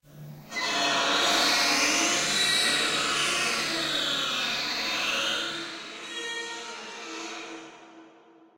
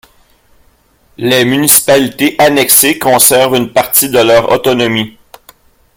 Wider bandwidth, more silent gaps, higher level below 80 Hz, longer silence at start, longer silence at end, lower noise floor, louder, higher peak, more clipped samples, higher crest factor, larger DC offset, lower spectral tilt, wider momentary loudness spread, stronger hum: second, 16 kHz vs over 20 kHz; neither; second, -64 dBFS vs -46 dBFS; second, 0.1 s vs 1.2 s; second, 0.5 s vs 0.9 s; first, -55 dBFS vs -50 dBFS; second, -24 LUFS vs -8 LUFS; second, -12 dBFS vs 0 dBFS; second, under 0.1% vs 0.7%; first, 16 dB vs 10 dB; neither; second, -0.5 dB/octave vs -2.5 dB/octave; first, 16 LU vs 7 LU; neither